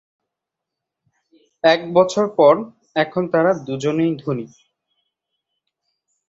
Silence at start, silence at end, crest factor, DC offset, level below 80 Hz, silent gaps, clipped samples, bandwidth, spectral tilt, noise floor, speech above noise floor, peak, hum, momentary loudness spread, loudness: 1.65 s; 1.85 s; 20 dB; under 0.1%; -64 dBFS; none; under 0.1%; 8 kHz; -6 dB/octave; -83 dBFS; 66 dB; -2 dBFS; none; 11 LU; -18 LUFS